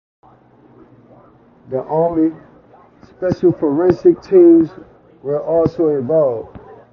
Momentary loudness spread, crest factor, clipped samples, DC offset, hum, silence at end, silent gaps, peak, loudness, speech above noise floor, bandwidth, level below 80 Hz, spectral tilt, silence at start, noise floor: 15 LU; 16 dB; under 0.1%; under 0.1%; none; 0.2 s; none; 0 dBFS; -15 LUFS; 34 dB; 6 kHz; -48 dBFS; -10 dB/octave; 1.7 s; -48 dBFS